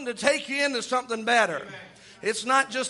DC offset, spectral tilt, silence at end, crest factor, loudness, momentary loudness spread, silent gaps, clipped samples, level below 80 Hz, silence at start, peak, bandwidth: under 0.1%; -2 dB/octave; 0 s; 20 dB; -25 LUFS; 12 LU; none; under 0.1%; -72 dBFS; 0 s; -6 dBFS; 11.5 kHz